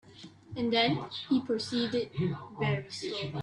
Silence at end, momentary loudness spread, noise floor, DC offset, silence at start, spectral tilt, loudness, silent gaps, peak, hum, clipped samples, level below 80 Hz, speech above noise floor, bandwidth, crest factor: 0 s; 9 LU; -51 dBFS; under 0.1%; 0.05 s; -5.5 dB/octave; -31 LUFS; none; -14 dBFS; none; under 0.1%; -64 dBFS; 20 dB; 11 kHz; 18 dB